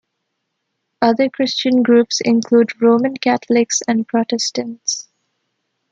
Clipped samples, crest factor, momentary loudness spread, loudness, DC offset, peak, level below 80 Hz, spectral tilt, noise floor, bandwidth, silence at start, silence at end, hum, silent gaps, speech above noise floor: under 0.1%; 16 dB; 8 LU; -16 LUFS; under 0.1%; 0 dBFS; -66 dBFS; -3.5 dB/octave; -74 dBFS; 7.8 kHz; 1 s; 0.9 s; none; none; 58 dB